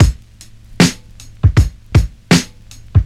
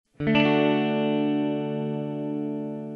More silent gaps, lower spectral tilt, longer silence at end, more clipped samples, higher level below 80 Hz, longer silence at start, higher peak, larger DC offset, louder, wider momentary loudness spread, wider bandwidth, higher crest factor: neither; second, -5.5 dB/octave vs -8.5 dB/octave; about the same, 0 s vs 0 s; neither; first, -22 dBFS vs -60 dBFS; second, 0 s vs 0.2 s; first, 0 dBFS vs -8 dBFS; neither; first, -15 LUFS vs -25 LUFS; first, 16 LU vs 9 LU; first, 15 kHz vs 6 kHz; about the same, 14 dB vs 16 dB